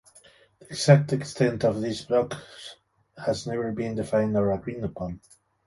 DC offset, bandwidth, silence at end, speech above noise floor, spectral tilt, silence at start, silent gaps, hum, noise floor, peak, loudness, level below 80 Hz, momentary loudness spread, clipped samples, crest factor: under 0.1%; 11.5 kHz; 0.5 s; 31 dB; -6.5 dB/octave; 0.7 s; none; none; -56 dBFS; -2 dBFS; -26 LUFS; -54 dBFS; 18 LU; under 0.1%; 24 dB